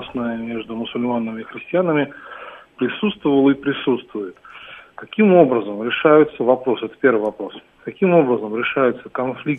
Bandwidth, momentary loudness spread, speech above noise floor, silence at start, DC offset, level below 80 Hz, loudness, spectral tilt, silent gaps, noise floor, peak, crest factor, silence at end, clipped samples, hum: 3.9 kHz; 21 LU; 22 dB; 0 s; under 0.1%; -60 dBFS; -18 LUFS; -9 dB/octave; none; -40 dBFS; 0 dBFS; 18 dB; 0 s; under 0.1%; none